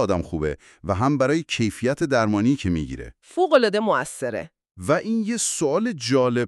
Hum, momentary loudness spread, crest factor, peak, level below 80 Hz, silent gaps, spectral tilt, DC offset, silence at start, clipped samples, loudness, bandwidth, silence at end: none; 13 LU; 18 dB; -4 dBFS; -46 dBFS; none; -5 dB/octave; under 0.1%; 0 s; under 0.1%; -22 LUFS; 13 kHz; 0 s